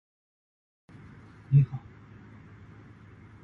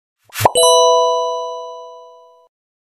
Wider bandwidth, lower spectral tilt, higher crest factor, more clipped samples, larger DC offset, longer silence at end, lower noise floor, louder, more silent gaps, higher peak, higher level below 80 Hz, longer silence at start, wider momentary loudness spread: second, 3.6 kHz vs 15.5 kHz; first, -11 dB/octave vs -1.5 dB/octave; first, 22 dB vs 16 dB; second, under 0.1% vs 0.1%; neither; first, 1.65 s vs 0.9 s; first, -51 dBFS vs -43 dBFS; second, -26 LUFS vs -13 LUFS; neither; second, -12 dBFS vs 0 dBFS; second, -58 dBFS vs -52 dBFS; first, 1.5 s vs 0.35 s; first, 27 LU vs 20 LU